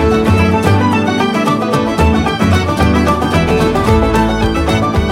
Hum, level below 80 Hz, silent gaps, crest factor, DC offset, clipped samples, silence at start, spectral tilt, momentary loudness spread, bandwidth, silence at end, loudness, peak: none; -22 dBFS; none; 12 dB; under 0.1%; under 0.1%; 0 s; -6.5 dB/octave; 2 LU; 16 kHz; 0 s; -12 LUFS; 0 dBFS